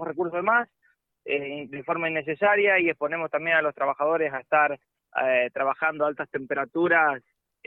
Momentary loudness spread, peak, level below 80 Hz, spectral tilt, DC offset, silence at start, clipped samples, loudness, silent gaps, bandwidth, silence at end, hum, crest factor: 12 LU; -8 dBFS; -72 dBFS; -8 dB/octave; under 0.1%; 0 s; under 0.1%; -24 LUFS; none; 4 kHz; 0.45 s; none; 16 dB